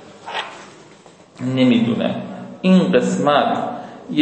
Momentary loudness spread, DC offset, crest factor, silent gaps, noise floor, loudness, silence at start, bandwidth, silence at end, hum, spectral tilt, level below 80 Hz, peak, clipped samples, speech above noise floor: 16 LU; under 0.1%; 16 dB; none; -45 dBFS; -18 LUFS; 0 s; 8.6 kHz; 0 s; none; -6.5 dB/octave; -66 dBFS; -2 dBFS; under 0.1%; 30 dB